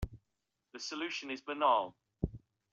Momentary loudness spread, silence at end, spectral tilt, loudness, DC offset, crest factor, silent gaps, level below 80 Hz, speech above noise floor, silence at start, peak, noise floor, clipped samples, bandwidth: 15 LU; 0.35 s; -4.5 dB/octave; -36 LUFS; under 0.1%; 20 dB; none; -52 dBFS; 51 dB; 0 s; -16 dBFS; -86 dBFS; under 0.1%; 8.2 kHz